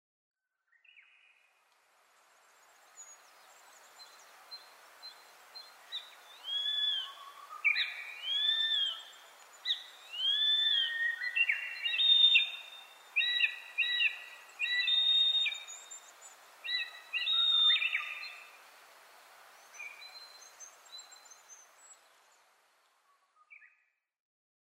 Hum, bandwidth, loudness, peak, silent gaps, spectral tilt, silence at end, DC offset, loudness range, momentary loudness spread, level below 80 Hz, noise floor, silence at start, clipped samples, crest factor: none; 16 kHz; -29 LUFS; -14 dBFS; none; 5 dB/octave; 1.05 s; under 0.1%; 23 LU; 26 LU; under -90 dBFS; -76 dBFS; 3 s; under 0.1%; 22 dB